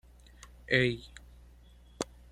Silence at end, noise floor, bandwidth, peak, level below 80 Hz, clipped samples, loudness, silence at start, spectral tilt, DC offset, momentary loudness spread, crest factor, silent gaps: 0.25 s; -56 dBFS; 14 kHz; -12 dBFS; -54 dBFS; under 0.1%; -31 LUFS; 0.7 s; -5 dB/octave; under 0.1%; 25 LU; 24 dB; none